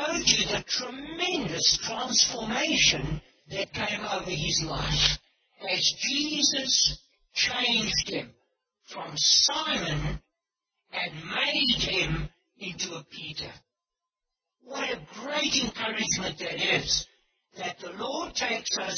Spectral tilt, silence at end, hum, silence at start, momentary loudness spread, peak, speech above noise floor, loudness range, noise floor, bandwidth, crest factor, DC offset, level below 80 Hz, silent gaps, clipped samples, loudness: -1.5 dB/octave; 0 s; none; 0 s; 15 LU; -4 dBFS; 60 dB; 6 LU; -89 dBFS; 6.8 kHz; 26 dB; under 0.1%; -48 dBFS; none; under 0.1%; -26 LUFS